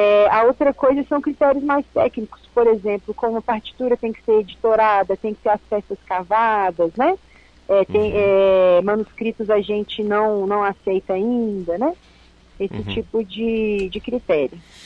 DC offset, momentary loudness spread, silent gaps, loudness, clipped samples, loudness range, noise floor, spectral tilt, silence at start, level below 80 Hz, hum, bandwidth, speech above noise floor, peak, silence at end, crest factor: under 0.1%; 10 LU; none; -19 LUFS; under 0.1%; 5 LU; -49 dBFS; -7.5 dB/octave; 0 s; -48 dBFS; none; 7.6 kHz; 30 dB; -6 dBFS; 0.25 s; 14 dB